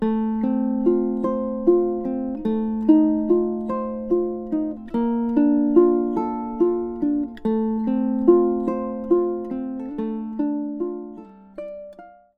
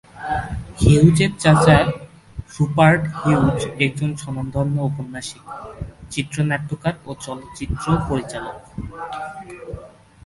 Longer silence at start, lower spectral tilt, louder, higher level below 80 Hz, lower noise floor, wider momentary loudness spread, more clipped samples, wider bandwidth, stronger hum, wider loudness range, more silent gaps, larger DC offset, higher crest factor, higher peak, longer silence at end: second, 0 s vs 0.15 s; first, -10.5 dB/octave vs -6.5 dB/octave; second, -22 LUFS vs -19 LUFS; second, -50 dBFS vs -36 dBFS; about the same, -44 dBFS vs -42 dBFS; second, 12 LU vs 21 LU; neither; second, 4 kHz vs 11.5 kHz; neither; second, 4 LU vs 10 LU; neither; neither; about the same, 18 dB vs 20 dB; second, -4 dBFS vs 0 dBFS; second, 0.25 s vs 0.4 s